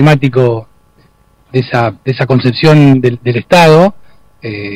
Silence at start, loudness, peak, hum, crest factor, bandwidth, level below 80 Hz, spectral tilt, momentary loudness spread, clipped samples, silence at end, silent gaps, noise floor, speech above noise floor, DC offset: 0 s; -9 LUFS; 0 dBFS; none; 10 dB; 14.5 kHz; -44 dBFS; -7 dB/octave; 14 LU; 0.2%; 0 s; none; -48 dBFS; 40 dB; under 0.1%